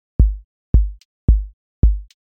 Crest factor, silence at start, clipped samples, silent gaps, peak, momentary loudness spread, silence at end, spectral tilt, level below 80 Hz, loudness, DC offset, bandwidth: 16 dB; 0.2 s; under 0.1%; 0.44-0.73 s, 1.05-1.28 s, 1.53-1.82 s; -2 dBFS; 11 LU; 0.3 s; -11 dB/octave; -18 dBFS; -20 LUFS; under 0.1%; 1.2 kHz